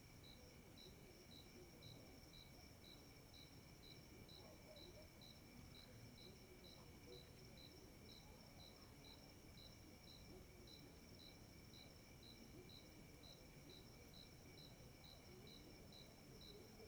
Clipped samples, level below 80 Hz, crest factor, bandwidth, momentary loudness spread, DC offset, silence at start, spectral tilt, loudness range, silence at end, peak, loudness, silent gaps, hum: under 0.1%; -72 dBFS; 16 dB; over 20 kHz; 2 LU; under 0.1%; 0 s; -4 dB/octave; 0 LU; 0 s; -48 dBFS; -62 LUFS; none; none